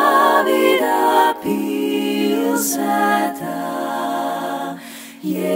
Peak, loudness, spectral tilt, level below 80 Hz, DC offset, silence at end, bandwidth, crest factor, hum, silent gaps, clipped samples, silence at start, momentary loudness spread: -2 dBFS; -18 LUFS; -3.5 dB/octave; -66 dBFS; under 0.1%; 0 s; 16.5 kHz; 16 dB; none; none; under 0.1%; 0 s; 11 LU